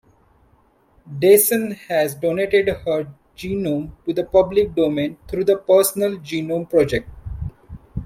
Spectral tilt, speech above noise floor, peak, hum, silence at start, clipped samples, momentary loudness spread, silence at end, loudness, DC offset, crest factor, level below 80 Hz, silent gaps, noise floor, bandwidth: -5 dB/octave; 39 dB; -2 dBFS; none; 1.05 s; under 0.1%; 18 LU; 0 s; -19 LUFS; under 0.1%; 18 dB; -42 dBFS; none; -57 dBFS; 16.5 kHz